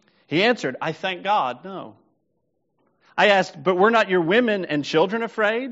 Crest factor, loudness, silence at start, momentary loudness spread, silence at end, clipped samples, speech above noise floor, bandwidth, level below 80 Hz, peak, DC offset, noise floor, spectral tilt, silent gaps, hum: 20 dB; -21 LUFS; 0.3 s; 10 LU; 0 s; under 0.1%; 52 dB; 8 kHz; -72 dBFS; -2 dBFS; under 0.1%; -73 dBFS; -2.5 dB/octave; none; none